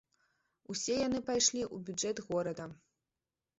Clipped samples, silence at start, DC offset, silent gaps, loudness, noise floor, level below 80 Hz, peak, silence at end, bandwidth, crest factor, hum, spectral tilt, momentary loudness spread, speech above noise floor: under 0.1%; 0.7 s; under 0.1%; none; -34 LUFS; under -90 dBFS; -68 dBFS; -16 dBFS; 0.85 s; 8 kHz; 22 dB; none; -3.5 dB/octave; 12 LU; over 55 dB